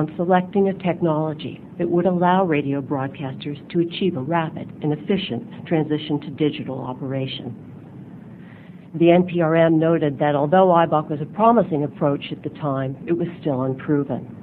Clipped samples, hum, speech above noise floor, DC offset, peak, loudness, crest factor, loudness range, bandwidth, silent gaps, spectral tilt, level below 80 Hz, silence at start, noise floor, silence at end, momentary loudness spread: under 0.1%; none; 20 dB; under 0.1%; -2 dBFS; -21 LUFS; 18 dB; 7 LU; 4.5 kHz; none; -10.5 dB/octave; -58 dBFS; 0 s; -41 dBFS; 0 s; 15 LU